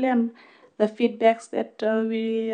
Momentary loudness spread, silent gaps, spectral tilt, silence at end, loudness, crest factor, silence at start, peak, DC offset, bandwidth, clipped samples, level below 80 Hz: 7 LU; none; -6 dB/octave; 0 s; -24 LUFS; 18 dB; 0 s; -6 dBFS; under 0.1%; 9.6 kHz; under 0.1%; -86 dBFS